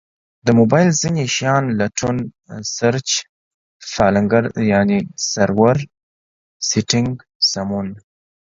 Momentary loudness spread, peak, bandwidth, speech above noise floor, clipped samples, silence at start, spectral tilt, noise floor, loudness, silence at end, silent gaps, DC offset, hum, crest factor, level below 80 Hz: 11 LU; 0 dBFS; 7.8 kHz; over 73 dB; under 0.1%; 0.45 s; -4.5 dB/octave; under -90 dBFS; -17 LUFS; 0.45 s; 3.29-3.80 s, 6.03-6.60 s, 7.35-7.40 s; under 0.1%; none; 18 dB; -48 dBFS